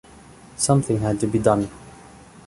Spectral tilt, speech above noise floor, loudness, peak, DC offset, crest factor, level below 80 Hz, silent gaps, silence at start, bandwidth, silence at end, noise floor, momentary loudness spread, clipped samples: -6 dB/octave; 26 dB; -21 LUFS; -4 dBFS; under 0.1%; 20 dB; -48 dBFS; none; 0.6 s; 11.5 kHz; 0.55 s; -46 dBFS; 10 LU; under 0.1%